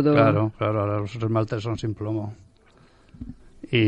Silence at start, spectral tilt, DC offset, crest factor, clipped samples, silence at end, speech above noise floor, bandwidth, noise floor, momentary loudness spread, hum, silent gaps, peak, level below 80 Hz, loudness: 0 s; -8 dB/octave; under 0.1%; 20 dB; under 0.1%; 0 s; 32 dB; 7.8 kHz; -55 dBFS; 23 LU; none; none; -4 dBFS; -52 dBFS; -24 LUFS